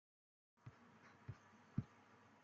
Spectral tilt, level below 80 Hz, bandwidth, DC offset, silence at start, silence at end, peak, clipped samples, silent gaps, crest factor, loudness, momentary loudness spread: -8 dB/octave; -74 dBFS; 7.4 kHz; under 0.1%; 0.55 s; 0 s; -28 dBFS; under 0.1%; none; 28 dB; -55 LUFS; 16 LU